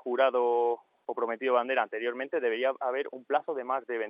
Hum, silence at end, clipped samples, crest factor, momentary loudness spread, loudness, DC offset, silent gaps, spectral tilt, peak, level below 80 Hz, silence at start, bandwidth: none; 0 s; under 0.1%; 18 dB; 7 LU; -30 LUFS; under 0.1%; none; -6 dB/octave; -12 dBFS; under -90 dBFS; 0.05 s; 5.2 kHz